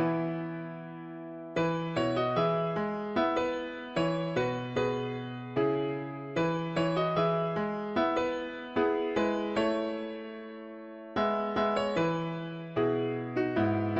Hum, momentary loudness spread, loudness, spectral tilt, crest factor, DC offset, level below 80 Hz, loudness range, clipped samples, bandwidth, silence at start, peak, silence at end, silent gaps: none; 11 LU; -31 LUFS; -7 dB/octave; 16 dB; under 0.1%; -62 dBFS; 2 LU; under 0.1%; 7.8 kHz; 0 s; -16 dBFS; 0 s; none